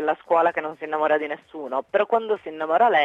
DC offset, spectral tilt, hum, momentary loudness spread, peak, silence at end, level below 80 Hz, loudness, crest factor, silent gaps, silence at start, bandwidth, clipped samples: under 0.1%; -5.5 dB/octave; none; 9 LU; -8 dBFS; 0 s; -74 dBFS; -23 LUFS; 14 dB; none; 0 s; 7.6 kHz; under 0.1%